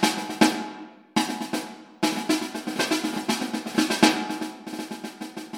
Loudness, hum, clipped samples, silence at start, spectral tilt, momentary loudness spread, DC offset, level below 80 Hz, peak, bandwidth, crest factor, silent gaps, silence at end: -26 LUFS; none; under 0.1%; 0 s; -3 dB/octave; 15 LU; under 0.1%; -70 dBFS; -2 dBFS; 16.5 kHz; 26 dB; none; 0 s